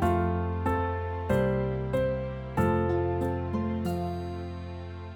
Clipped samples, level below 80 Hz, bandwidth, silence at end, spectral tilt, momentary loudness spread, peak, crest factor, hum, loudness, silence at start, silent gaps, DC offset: under 0.1%; -42 dBFS; 18 kHz; 0 s; -8.5 dB/octave; 10 LU; -14 dBFS; 16 dB; none; -30 LUFS; 0 s; none; under 0.1%